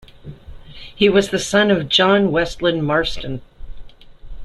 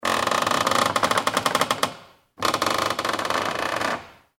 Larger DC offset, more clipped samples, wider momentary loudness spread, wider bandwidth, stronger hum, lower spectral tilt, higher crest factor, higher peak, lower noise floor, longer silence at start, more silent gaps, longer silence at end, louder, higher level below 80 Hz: neither; neither; first, 17 LU vs 6 LU; second, 12.5 kHz vs 17.5 kHz; neither; first, -4.5 dB/octave vs -2 dB/octave; about the same, 18 dB vs 20 dB; about the same, -2 dBFS vs -4 dBFS; second, -37 dBFS vs -45 dBFS; first, 0.25 s vs 0 s; neither; second, 0 s vs 0.25 s; first, -16 LUFS vs -23 LUFS; first, -38 dBFS vs -56 dBFS